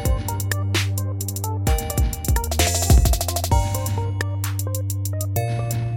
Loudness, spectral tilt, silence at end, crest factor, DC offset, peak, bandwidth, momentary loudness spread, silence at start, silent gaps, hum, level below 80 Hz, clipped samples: -22 LUFS; -4.5 dB/octave; 0 s; 18 dB; under 0.1%; -4 dBFS; 17 kHz; 8 LU; 0 s; none; none; -26 dBFS; under 0.1%